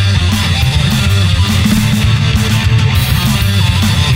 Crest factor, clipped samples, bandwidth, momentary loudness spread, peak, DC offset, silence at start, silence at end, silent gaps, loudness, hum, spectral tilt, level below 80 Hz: 10 dB; under 0.1%; 16.5 kHz; 1 LU; 0 dBFS; under 0.1%; 0 s; 0 s; none; -11 LUFS; none; -5 dB/octave; -20 dBFS